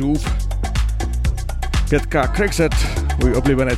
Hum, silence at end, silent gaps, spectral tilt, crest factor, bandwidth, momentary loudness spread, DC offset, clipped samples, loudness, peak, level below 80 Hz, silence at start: none; 0 s; none; -6 dB/octave; 14 dB; 14 kHz; 6 LU; under 0.1%; under 0.1%; -20 LUFS; -4 dBFS; -20 dBFS; 0 s